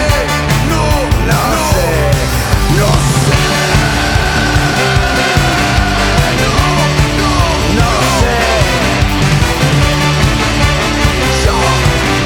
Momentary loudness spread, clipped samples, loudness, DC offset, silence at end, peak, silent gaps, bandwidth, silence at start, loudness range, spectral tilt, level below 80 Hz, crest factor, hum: 1 LU; under 0.1%; -11 LUFS; under 0.1%; 0 s; 0 dBFS; none; over 20 kHz; 0 s; 0 LU; -4.5 dB/octave; -18 dBFS; 10 dB; none